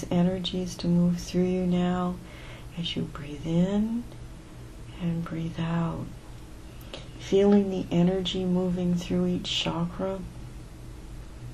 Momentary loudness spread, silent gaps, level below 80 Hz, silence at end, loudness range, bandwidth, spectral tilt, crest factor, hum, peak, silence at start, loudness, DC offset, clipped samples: 20 LU; none; -46 dBFS; 0 s; 6 LU; 12 kHz; -6.5 dB/octave; 18 dB; 60 Hz at -50 dBFS; -10 dBFS; 0 s; -27 LUFS; under 0.1%; under 0.1%